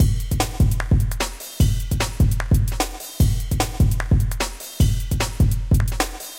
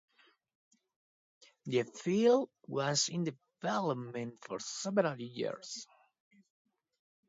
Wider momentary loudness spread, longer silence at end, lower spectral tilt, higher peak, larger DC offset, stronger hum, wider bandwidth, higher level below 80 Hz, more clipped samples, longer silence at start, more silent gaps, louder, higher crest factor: second, 6 LU vs 14 LU; second, 0 s vs 1.45 s; about the same, -5 dB/octave vs -4 dB/octave; first, -6 dBFS vs -16 dBFS; neither; neither; first, 17 kHz vs 7.8 kHz; first, -24 dBFS vs -84 dBFS; neither; second, 0 s vs 1.65 s; neither; first, -22 LUFS vs -34 LUFS; second, 14 dB vs 20 dB